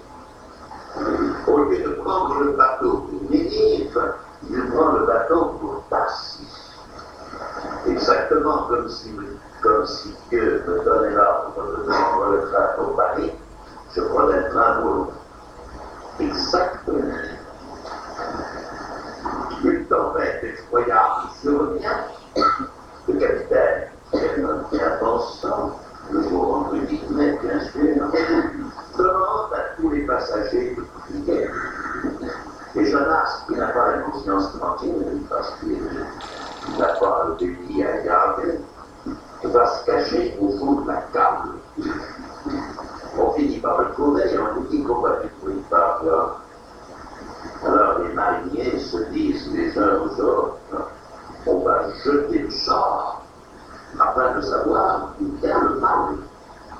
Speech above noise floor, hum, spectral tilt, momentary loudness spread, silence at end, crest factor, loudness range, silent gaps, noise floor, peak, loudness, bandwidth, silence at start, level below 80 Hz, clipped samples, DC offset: 23 dB; none; -6 dB/octave; 16 LU; 0 s; 20 dB; 4 LU; none; -43 dBFS; -2 dBFS; -21 LUFS; 10.5 kHz; 0 s; -44 dBFS; under 0.1%; under 0.1%